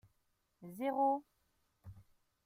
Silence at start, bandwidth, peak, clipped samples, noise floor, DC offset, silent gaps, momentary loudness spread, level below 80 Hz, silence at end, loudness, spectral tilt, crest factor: 0.6 s; 16 kHz; -24 dBFS; under 0.1%; -80 dBFS; under 0.1%; none; 25 LU; -76 dBFS; 0.45 s; -36 LUFS; -7 dB/octave; 18 dB